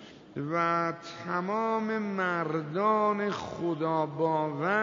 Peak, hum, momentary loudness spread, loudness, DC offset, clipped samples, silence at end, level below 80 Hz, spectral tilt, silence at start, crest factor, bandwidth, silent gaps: -14 dBFS; none; 7 LU; -30 LUFS; under 0.1%; under 0.1%; 0 s; -70 dBFS; -7 dB/octave; 0 s; 16 dB; 7.6 kHz; none